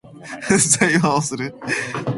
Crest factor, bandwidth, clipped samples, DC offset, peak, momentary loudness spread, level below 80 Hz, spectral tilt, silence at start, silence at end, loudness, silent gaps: 20 dB; 11.5 kHz; under 0.1%; under 0.1%; 0 dBFS; 14 LU; -54 dBFS; -3.5 dB/octave; 0.05 s; 0 s; -18 LUFS; none